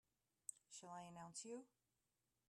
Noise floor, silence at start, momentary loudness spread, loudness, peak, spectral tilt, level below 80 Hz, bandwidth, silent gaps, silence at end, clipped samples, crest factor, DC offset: under -90 dBFS; 0.5 s; 4 LU; -57 LUFS; -36 dBFS; -3 dB/octave; under -90 dBFS; 13 kHz; none; 0.8 s; under 0.1%; 24 dB; under 0.1%